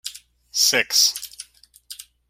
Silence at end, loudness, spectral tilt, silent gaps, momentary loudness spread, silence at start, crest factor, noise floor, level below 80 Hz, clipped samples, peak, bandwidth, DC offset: 0.3 s; -17 LUFS; 1.5 dB/octave; none; 24 LU; 0.05 s; 22 dB; -49 dBFS; -64 dBFS; under 0.1%; -4 dBFS; 16.5 kHz; under 0.1%